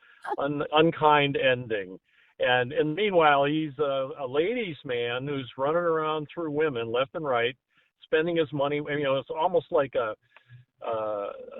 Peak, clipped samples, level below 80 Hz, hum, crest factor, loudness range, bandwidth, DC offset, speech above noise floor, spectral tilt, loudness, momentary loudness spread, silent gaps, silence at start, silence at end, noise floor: -6 dBFS; under 0.1%; -64 dBFS; none; 20 dB; 4 LU; 4.1 kHz; under 0.1%; 28 dB; -8.5 dB/octave; -26 LUFS; 11 LU; none; 0.25 s; 0 s; -54 dBFS